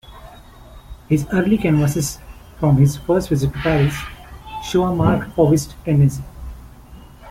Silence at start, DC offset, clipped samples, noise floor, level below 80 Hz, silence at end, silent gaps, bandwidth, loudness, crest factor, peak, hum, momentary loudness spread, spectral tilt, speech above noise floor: 0.1 s; under 0.1%; under 0.1%; -41 dBFS; -36 dBFS; 0 s; none; 15.5 kHz; -18 LUFS; 16 dB; -2 dBFS; none; 18 LU; -7 dB/octave; 24 dB